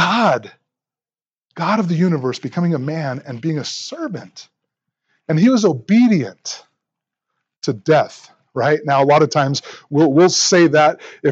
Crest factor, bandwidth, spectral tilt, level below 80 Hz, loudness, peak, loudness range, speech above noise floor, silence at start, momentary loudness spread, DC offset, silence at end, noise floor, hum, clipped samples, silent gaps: 16 dB; 8.2 kHz; -5 dB/octave; -72 dBFS; -16 LUFS; -2 dBFS; 7 LU; over 74 dB; 0 s; 14 LU; under 0.1%; 0 s; under -90 dBFS; none; under 0.1%; none